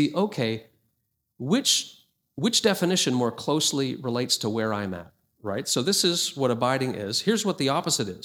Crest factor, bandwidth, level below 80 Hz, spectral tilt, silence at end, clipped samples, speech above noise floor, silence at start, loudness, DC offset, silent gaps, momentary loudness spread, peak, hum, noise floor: 18 dB; 20 kHz; -68 dBFS; -3.5 dB/octave; 0.05 s; under 0.1%; 51 dB; 0 s; -24 LUFS; under 0.1%; none; 12 LU; -8 dBFS; none; -76 dBFS